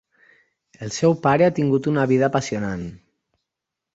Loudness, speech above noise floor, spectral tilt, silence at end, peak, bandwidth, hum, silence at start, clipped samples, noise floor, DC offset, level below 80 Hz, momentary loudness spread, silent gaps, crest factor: -20 LUFS; 65 dB; -6.5 dB/octave; 1 s; -4 dBFS; 8 kHz; none; 0.8 s; under 0.1%; -84 dBFS; under 0.1%; -54 dBFS; 14 LU; none; 18 dB